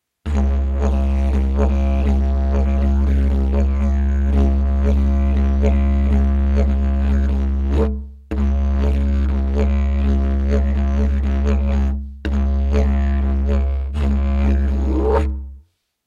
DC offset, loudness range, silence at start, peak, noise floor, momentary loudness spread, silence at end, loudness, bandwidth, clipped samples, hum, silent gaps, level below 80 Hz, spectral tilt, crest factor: under 0.1%; 2 LU; 0.25 s; -6 dBFS; -49 dBFS; 4 LU; 0.5 s; -19 LUFS; 6.6 kHz; under 0.1%; none; none; -18 dBFS; -9 dB/octave; 12 dB